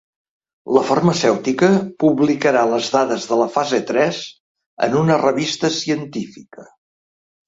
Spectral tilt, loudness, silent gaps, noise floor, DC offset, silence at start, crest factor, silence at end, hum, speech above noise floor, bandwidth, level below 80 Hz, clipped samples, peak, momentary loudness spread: -5 dB/octave; -17 LUFS; 4.40-4.55 s, 4.66-4.77 s; under -90 dBFS; under 0.1%; 0.65 s; 18 dB; 0.85 s; none; over 73 dB; 8 kHz; -58 dBFS; under 0.1%; -2 dBFS; 8 LU